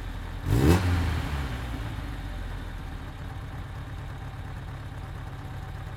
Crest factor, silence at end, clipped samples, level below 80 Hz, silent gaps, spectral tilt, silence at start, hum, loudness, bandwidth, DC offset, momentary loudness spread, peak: 22 dB; 0 s; under 0.1%; -36 dBFS; none; -6.5 dB/octave; 0 s; none; -31 LUFS; 17 kHz; under 0.1%; 15 LU; -8 dBFS